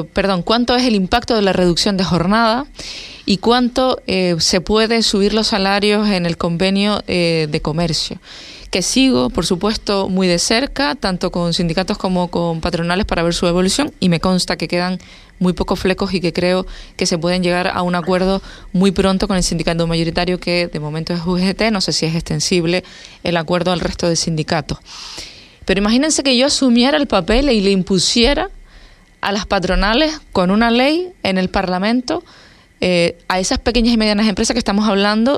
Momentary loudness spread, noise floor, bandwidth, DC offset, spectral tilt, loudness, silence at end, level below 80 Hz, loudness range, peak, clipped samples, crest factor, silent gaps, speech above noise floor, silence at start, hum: 8 LU; -43 dBFS; 13.5 kHz; under 0.1%; -4.5 dB/octave; -16 LUFS; 0 s; -32 dBFS; 3 LU; 0 dBFS; under 0.1%; 16 dB; none; 27 dB; 0 s; none